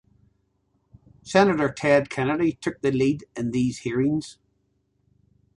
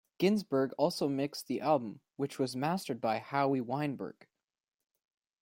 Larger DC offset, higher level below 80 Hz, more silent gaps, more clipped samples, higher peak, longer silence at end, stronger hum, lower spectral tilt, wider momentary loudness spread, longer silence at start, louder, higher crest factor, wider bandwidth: neither; first, -56 dBFS vs -78 dBFS; neither; neither; first, -4 dBFS vs -14 dBFS; about the same, 1.25 s vs 1.3 s; first, 50 Hz at -55 dBFS vs none; about the same, -6 dB/octave vs -6 dB/octave; about the same, 8 LU vs 9 LU; first, 1.25 s vs 0.2 s; first, -23 LUFS vs -33 LUFS; about the same, 22 dB vs 20 dB; second, 11.5 kHz vs 16.5 kHz